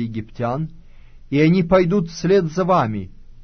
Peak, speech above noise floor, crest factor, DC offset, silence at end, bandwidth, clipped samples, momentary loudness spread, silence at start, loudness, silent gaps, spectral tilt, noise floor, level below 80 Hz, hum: -4 dBFS; 23 dB; 16 dB; under 0.1%; 0.1 s; 6.6 kHz; under 0.1%; 13 LU; 0 s; -19 LUFS; none; -7.5 dB/octave; -41 dBFS; -42 dBFS; none